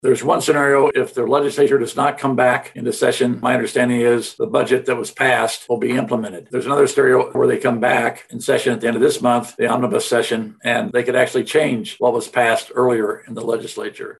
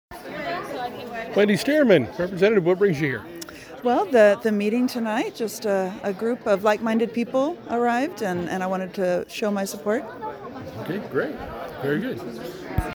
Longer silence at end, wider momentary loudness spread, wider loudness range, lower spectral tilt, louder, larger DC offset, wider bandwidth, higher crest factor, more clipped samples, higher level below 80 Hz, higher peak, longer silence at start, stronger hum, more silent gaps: about the same, 0.1 s vs 0 s; second, 8 LU vs 15 LU; second, 2 LU vs 7 LU; second, -4.5 dB/octave vs -6 dB/octave; first, -18 LUFS vs -23 LUFS; neither; second, 12.5 kHz vs over 20 kHz; about the same, 16 dB vs 20 dB; neither; second, -64 dBFS vs -48 dBFS; about the same, -2 dBFS vs -4 dBFS; about the same, 0.05 s vs 0.1 s; neither; neither